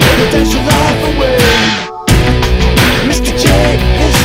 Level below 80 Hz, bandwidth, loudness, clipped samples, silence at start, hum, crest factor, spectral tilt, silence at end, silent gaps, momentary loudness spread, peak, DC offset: -16 dBFS; 16.5 kHz; -10 LUFS; 0.3%; 0 s; none; 10 dB; -4.5 dB/octave; 0 s; none; 4 LU; 0 dBFS; under 0.1%